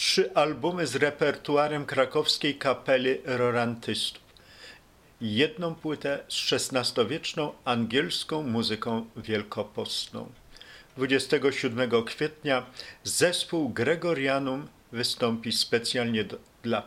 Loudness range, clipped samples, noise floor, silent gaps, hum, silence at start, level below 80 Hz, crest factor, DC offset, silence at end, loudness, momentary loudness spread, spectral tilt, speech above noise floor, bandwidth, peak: 4 LU; under 0.1%; -55 dBFS; none; none; 0 s; -62 dBFS; 20 dB; under 0.1%; 0 s; -27 LUFS; 9 LU; -3.5 dB/octave; 28 dB; 16 kHz; -8 dBFS